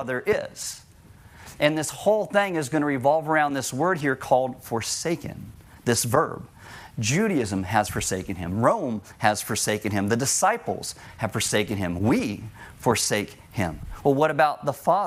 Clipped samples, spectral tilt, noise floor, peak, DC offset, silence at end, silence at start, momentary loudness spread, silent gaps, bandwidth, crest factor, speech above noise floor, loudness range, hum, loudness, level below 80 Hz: under 0.1%; -4 dB/octave; -49 dBFS; -4 dBFS; under 0.1%; 0 s; 0 s; 12 LU; none; 16 kHz; 20 dB; 25 dB; 2 LU; none; -24 LUFS; -52 dBFS